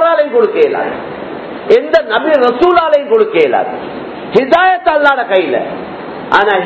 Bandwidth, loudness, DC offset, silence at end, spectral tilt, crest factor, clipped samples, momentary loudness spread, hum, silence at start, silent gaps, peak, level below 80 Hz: 8 kHz; -11 LUFS; under 0.1%; 0 s; -6 dB/octave; 12 dB; 0.7%; 15 LU; none; 0 s; none; 0 dBFS; -50 dBFS